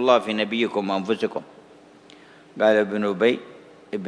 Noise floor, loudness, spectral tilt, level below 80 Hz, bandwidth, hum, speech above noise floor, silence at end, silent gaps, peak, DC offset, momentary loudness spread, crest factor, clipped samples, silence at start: -49 dBFS; -23 LUFS; -5.5 dB/octave; -74 dBFS; 11 kHz; none; 28 dB; 0 s; none; -4 dBFS; under 0.1%; 13 LU; 20 dB; under 0.1%; 0 s